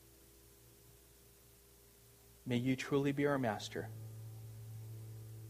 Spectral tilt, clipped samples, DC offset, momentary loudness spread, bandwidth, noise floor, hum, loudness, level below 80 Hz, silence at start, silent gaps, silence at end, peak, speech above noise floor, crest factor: -6 dB/octave; under 0.1%; under 0.1%; 27 LU; 15.5 kHz; -64 dBFS; 60 Hz at -65 dBFS; -39 LUFS; -68 dBFS; 0 s; none; 0 s; -22 dBFS; 27 dB; 20 dB